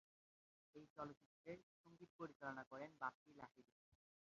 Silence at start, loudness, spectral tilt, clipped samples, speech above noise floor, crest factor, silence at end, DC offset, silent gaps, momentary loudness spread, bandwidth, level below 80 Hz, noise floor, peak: 0.75 s; -56 LUFS; -4.5 dB/octave; under 0.1%; over 34 dB; 24 dB; 0.4 s; under 0.1%; 0.90-0.96 s, 1.17-1.44 s, 1.63-1.84 s, 2.10-2.19 s, 2.35-2.40 s, 2.67-2.71 s, 3.14-3.26 s, 3.72-3.92 s; 15 LU; 7.2 kHz; -88 dBFS; under -90 dBFS; -34 dBFS